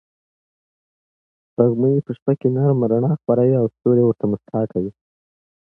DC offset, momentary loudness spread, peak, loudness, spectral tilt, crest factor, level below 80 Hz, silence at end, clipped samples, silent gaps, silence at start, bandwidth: under 0.1%; 7 LU; -2 dBFS; -19 LUFS; -13.5 dB/octave; 18 dB; -58 dBFS; 0.85 s; under 0.1%; 2.22-2.26 s; 1.6 s; 3.4 kHz